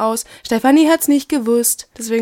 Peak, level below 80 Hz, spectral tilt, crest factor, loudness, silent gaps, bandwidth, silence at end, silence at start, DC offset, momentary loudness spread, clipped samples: -2 dBFS; -54 dBFS; -3 dB/octave; 14 dB; -15 LUFS; none; 19 kHz; 0 s; 0 s; under 0.1%; 10 LU; under 0.1%